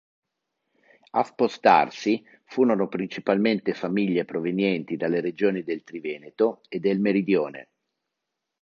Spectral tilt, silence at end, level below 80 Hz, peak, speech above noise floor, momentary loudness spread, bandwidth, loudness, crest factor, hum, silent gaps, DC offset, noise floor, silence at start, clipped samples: -7 dB/octave; 1 s; -72 dBFS; -4 dBFS; 59 dB; 11 LU; 7.4 kHz; -25 LUFS; 22 dB; none; none; under 0.1%; -83 dBFS; 1.15 s; under 0.1%